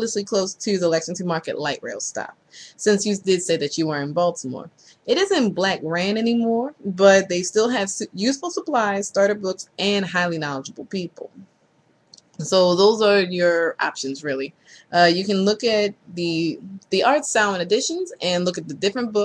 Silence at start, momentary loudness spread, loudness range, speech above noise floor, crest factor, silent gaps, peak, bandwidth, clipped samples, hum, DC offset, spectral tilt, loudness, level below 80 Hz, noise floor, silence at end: 0 s; 12 LU; 4 LU; 40 dB; 20 dB; none; -2 dBFS; 11 kHz; under 0.1%; none; under 0.1%; -4 dB/octave; -21 LUFS; -64 dBFS; -61 dBFS; 0 s